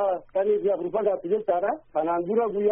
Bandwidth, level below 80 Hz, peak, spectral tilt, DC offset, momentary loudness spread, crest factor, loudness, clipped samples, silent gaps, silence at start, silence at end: 3.6 kHz; -62 dBFS; -12 dBFS; -2.5 dB/octave; under 0.1%; 3 LU; 14 dB; -25 LUFS; under 0.1%; none; 0 s; 0 s